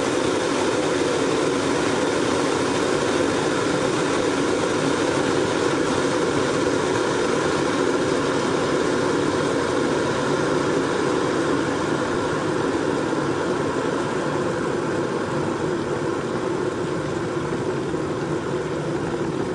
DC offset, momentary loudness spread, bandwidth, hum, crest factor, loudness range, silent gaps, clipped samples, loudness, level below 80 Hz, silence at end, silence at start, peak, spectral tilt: under 0.1%; 4 LU; 11.5 kHz; none; 12 dB; 3 LU; none; under 0.1%; -22 LUFS; -50 dBFS; 0 s; 0 s; -10 dBFS; -5 dB/octave